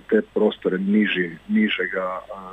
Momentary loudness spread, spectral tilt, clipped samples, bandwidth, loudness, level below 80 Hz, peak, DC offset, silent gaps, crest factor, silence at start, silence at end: 7 LU; -8 dB/octave; under 0.1%; 3.9 kHz; -22 LUFS; -58 dBFS; -4 dBFS; under 0.1%; none; 18 dB; 0.1 s; 0 s